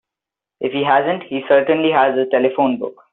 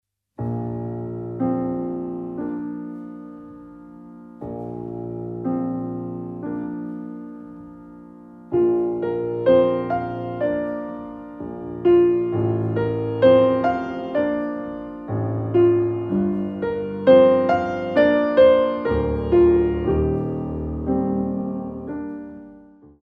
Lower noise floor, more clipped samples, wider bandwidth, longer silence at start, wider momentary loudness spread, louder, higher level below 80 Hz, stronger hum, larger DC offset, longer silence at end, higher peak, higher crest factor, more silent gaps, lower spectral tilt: first, -86 dBFS vs -47 dBFS; neither; second, 4.1 kHz vs 5.2 kHz; first, 0.6 s vs 0.4 s; second, 9 LU vs 20 LU; first, -17 LUFS vs -21 LUFS; second, -66 dBFS vs -42 dBFS; neither; neither; about the same, 0.2 s vs 0.15 s; about the same, 0 dBFS vs -2 dBFS; about the same, 16 dB vs 18 dB; neither; second, -3 dB/octave vs -10 dB/octave